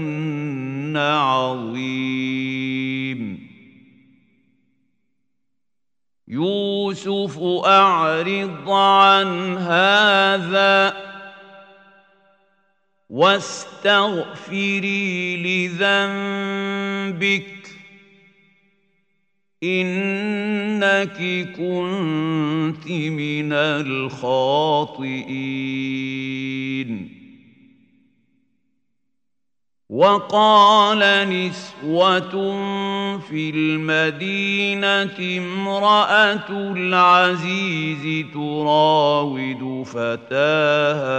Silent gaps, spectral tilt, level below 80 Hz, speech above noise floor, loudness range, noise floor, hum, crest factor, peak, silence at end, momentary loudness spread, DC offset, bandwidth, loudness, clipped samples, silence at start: none; -5 dB/octave; -70 dBFS; 68 dB; 11 LU; -87 dBFS; none; 20 dB; 0 dBFS; 0 s; 13 LU; under 0.1%; 9.2 kHz; -19 LUFS; under 0.1%; 0 s